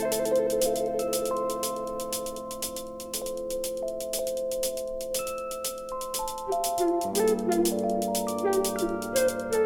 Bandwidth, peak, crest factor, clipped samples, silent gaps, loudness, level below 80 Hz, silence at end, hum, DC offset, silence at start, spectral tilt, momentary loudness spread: over 20 kHz; -12 dBFS; 16 dB; under 0.1%; none; -29 LUFS; -52 dBFS; 0 s; none; under 0.1%; 0 s; -3.5 dB/octave; 8 LU